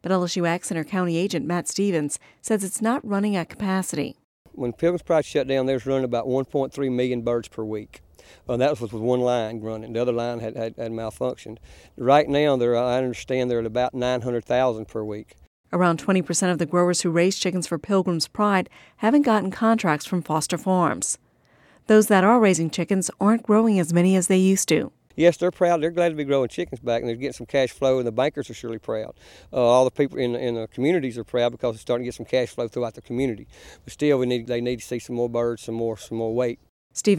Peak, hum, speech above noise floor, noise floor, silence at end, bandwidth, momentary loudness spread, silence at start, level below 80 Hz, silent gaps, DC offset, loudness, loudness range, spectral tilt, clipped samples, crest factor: -4 dBFS; none; 35 dB; -58 dBFS; 0 s; 15.5 kHz; 11 LU; 0.05 s; -56 dBFS; 4.24-4.45 s, 15.47-15.64 s, 36.69-36.90 s; under 0.1%; -23 LUFS; 6 LU; -5 dB/octave; under 0.1%; 18 dB